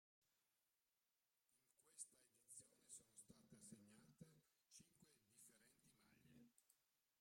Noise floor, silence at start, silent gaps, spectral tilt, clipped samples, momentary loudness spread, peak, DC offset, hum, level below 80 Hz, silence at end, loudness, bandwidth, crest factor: under -90 dBFS; 0.2 s; none; -3 dB/octave; under 0.1%; 9 LU; -42 dBFS; under 0.1%; none; under -90 dBFS; 0 s; -65 LUFS; 16 kHz; 30 dB